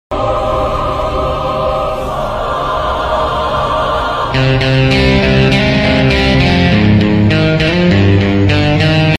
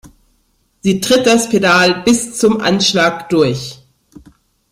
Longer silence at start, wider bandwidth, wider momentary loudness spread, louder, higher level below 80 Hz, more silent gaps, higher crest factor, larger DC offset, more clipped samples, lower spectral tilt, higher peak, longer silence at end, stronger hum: about the same, 0.1 s vs 0.05 s; second, 12 kHz vs 16 kHz; about the same, 6 LU vs 7 LU; about the same, -12 LUFS vs -13 LUFS; first, -24 dBFS vs -48 dBFS; neither; about the same, 10 dB vs 14 dB; neither; neither; first, -7 dB/octave vs -4 dB/octave; about the same, 0 dBFS vs 0 dBFS; second, 0 s vs 0.95 s; neither